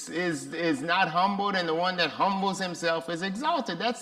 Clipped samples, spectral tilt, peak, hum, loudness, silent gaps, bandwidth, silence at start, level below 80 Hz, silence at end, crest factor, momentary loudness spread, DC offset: under 0.1%; -4 dB/octave; -10 dBFS; none; -27 LUFS; none; 15 kHz; 0 s; -70 dBFS; 0 s; 18 dB; 5 LU; under 0.1%